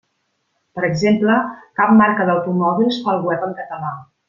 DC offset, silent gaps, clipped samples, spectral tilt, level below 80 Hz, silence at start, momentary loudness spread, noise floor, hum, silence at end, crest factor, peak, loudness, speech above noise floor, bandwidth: under 0.1%; none; under 0.1%; -7 dB/octave; -58 dBFS; 0.75 s; 14 LU; -69 dBFS; none; 0.25 s; 16 dB; -2 dBFS; -17 LUFS; 52 dB; 7.4 kHz